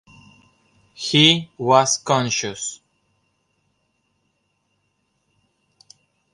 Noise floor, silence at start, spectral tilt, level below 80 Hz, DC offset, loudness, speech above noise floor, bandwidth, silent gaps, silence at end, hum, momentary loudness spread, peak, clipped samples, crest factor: -70 dBFS; 1 s; -3 dB/octave; -64 dBFS; under 0.1%; -18 LUFS; 51 dB; 11.5 kHz; none; 3.6 s; none; 16 LU; 0 dBFS; under 0.1%; 24 dB